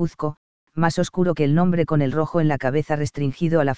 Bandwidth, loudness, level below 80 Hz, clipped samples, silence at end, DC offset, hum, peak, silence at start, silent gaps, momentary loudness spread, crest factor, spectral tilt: 8 kHz; -21 LUFS; -48 dBFS; under 0.1%; 0 s; 2%; none; -4 dBFS; 0 s; 0.37-0.67 s; 7 LU; 18 dB; -7.5 dB/octave